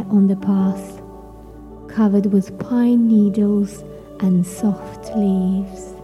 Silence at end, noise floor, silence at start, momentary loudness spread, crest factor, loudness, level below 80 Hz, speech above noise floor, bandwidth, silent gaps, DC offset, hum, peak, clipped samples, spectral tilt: 0 s; -38 dBFS; 0 s; 21 LU; 12 dB; -18 LUFS; -46 dBFS; 21 dB; 12 kHz; none; under 0.1%; none; -6 dBFS; under 0.1%; -8.5 dB/octave